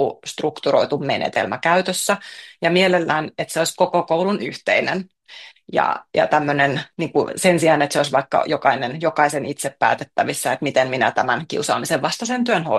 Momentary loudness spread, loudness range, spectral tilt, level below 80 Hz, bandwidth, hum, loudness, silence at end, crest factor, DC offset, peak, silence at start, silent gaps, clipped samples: 8 LU; 2 LU; -4 dB/octave; -64 dBFS; 12.5 kHz; none; -19 LUFS; 0 s; 18 dB; under 0.1%; -2 dBFS; 0 s; none; under 0.1%